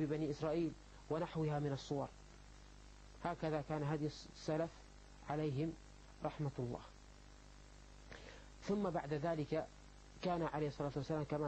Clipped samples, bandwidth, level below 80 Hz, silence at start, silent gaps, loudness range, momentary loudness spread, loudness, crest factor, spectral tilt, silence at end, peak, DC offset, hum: under 0.1%; 8.6 kHz; -60 dBFS; 0 s; none; 4 LU; 21 LU; -42 LUFS; 18 dB; -7 dB/octave; 0 s; -26 dBFS; under 0.1%; 50 Hz at -60 dBFS